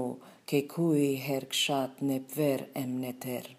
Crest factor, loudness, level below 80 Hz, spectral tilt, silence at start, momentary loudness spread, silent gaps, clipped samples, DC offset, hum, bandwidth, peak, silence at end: 16 dB; -31 LUFS; -84 dBFS; -5 dB/octave; 0 s; 9 LU; none; under 0.1%; under 0.1%; none; 15.5 kHz; -14 dBFS; 0.05 s